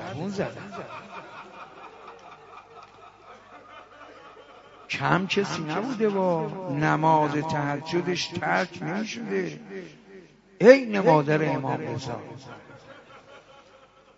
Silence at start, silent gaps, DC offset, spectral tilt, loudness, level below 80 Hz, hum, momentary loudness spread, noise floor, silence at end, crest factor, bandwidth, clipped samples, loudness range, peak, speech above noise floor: 0 s; none; under 0.1%; -6 dB/octave; -24 LUFS; -66 dBFS; none; 25 LU; -55 dBFS; 0.8 s; 26 dB; 7.8 kHz; under 0.1%; 20 LU; 0 dBFS; 30 dB